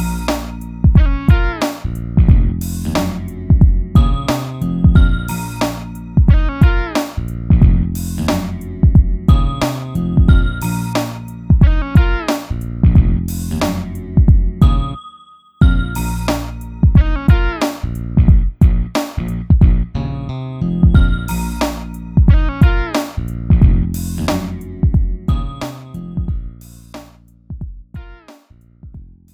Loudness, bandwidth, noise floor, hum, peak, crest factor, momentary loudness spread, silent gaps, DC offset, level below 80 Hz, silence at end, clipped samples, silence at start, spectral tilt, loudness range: -16 LUFS; 18 kHz; -46 dBFS; none; 0 dBFS; 14 dB; 13 LU; none; under 0.1%; -16 dBFS; 0.3 s; under 0.1%; 0 s; -7 dB/octave; 5 LU